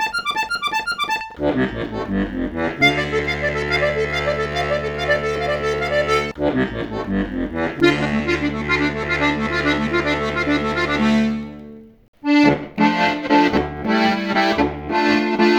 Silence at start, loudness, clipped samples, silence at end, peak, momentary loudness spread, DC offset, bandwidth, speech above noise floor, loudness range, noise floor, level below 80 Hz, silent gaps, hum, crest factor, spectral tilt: 0 s; -19 LUFS; under 0.1%; 0 s; -2 dBFS; 7 LU; under 0.1%; 19.5 kHz; 19 dB; 3 LU; -39 dBFS; -38 dBFS; 12.08-12.13 s; none; 18 dB; -5.5 dB/octave